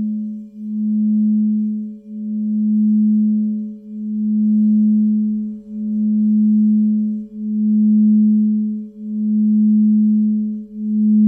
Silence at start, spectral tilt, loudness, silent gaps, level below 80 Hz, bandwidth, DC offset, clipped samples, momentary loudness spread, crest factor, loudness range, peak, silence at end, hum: 0 s; -14 dB/octave; -17 LUFS; none; -64 dBFS; 0.6 kHz; under 0.1%; under 0.1%; 13 LU; 8 dB; 3 LU; -8 dBFS; 0 s; none